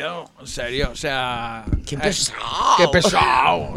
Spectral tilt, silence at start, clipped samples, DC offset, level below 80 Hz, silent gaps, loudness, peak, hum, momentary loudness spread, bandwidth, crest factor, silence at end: -3.5 dB/octave; 0 s; under 0.1%; under 0.1%; -34 dBFS; none; -19 LUFS; -2 dBFS; none; 14 LU; 16 kHz; 18 dB; 0 s